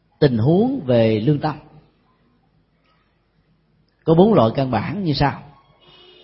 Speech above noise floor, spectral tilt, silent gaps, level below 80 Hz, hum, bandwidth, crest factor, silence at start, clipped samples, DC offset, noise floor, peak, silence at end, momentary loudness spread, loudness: 46 dB; -12 dB/octave; none; -46 dBFS; none; 5.8 kHz; 20 dB; 0.2 s; under 0.1%; under 0.1%; -62 dBFS; 0 dBFS; 0.8 s; 12 LU; -18 LUFS